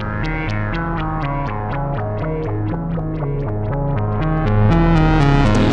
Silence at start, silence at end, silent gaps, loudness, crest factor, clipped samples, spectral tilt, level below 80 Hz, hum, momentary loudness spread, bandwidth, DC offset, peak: 0 s; 0 s; none; -19 LUFS; 12 dB; under 0.1%; -8 dB/octave; -24 dBFS; none; 8 LU; 8.8 kHz; under 0.1%; -6 dBFS